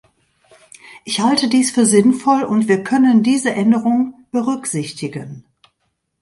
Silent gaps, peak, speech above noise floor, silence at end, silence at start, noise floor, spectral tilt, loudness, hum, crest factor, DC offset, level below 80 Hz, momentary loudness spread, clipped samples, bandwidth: none; 0 dBFS; 55 dB; 0.8 s; 0.9 s; -70 dBFS; -4.5 dB/octave; -16 LUFS; none; 16 dB; under 0.1%; -62 dBFS; 13 LU; under 0.1%; 11.5 kHz